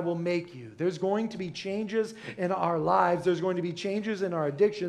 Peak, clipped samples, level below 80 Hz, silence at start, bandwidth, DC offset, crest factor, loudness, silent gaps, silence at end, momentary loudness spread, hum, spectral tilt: -10 dBFS; under 0.1%; -68 dBFS; 0 s; 11 kHz; under 0.1%; 18 dB; -29 LUFS; none; 0 s; 9 LU; none; -6.5 dB/octave